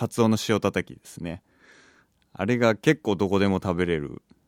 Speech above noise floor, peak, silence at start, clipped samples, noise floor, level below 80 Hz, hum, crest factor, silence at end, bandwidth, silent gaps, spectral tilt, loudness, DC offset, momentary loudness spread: 36 dB; -8 dBFS; 0 s; under 0.1%; -60 dBFS; -54 dBFS; none; 18 dB; 0.35 s; 16.5 kHz; none; -6 dB/octave; -24 LUFS; under 0.1%; 15 LU